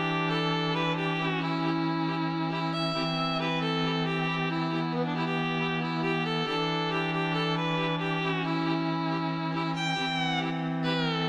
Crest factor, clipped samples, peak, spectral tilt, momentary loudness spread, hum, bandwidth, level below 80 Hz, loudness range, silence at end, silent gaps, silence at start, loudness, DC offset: 12 dB; under 0.1%; -16 dBFS; -6 dB/octave; 2 LU; none; 8.4 kHz; -66 dBFS; 0 LU; 0 s; none; 0 s; -29 LUFS; under 0.1%